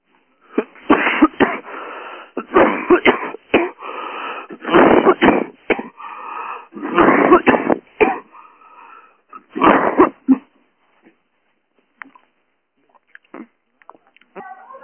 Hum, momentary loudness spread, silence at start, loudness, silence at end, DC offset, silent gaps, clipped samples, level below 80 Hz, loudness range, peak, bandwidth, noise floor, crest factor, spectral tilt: none; 19 LU; 0.55 s; -15 LUFS; 0.05 s; under 0.1%; none; under 0.1%; -50 dBFS; 4 LU; 0 dBFS; 3.3 kHz; -67 dBFS; 18 dB; -9 dB/octave